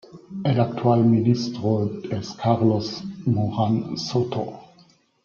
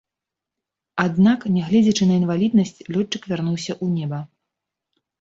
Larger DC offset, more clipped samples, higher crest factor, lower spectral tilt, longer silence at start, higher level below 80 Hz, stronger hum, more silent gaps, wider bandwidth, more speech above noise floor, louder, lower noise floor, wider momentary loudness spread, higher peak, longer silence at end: neither; neither; about the same, 18 dB vs 16 dB; about the same, -7.5 dB/octave vs -6.5 dB/octave; second, 0.15 s vs 0.95 s; about the same, -58 dBFS vs -58 dBFS; neither; neither; second, 7 kHz vs 7.8 kHz; second, 35 dB vs 67 dB; second, -23 LUFS vs -20 LUFS; second, -57 dBFS vs -86 dBFS; first, 12 LU vs 9 LU; about the same, -6 dBFS vs -6 dBFS; second, 0.6 s vs 0.95 s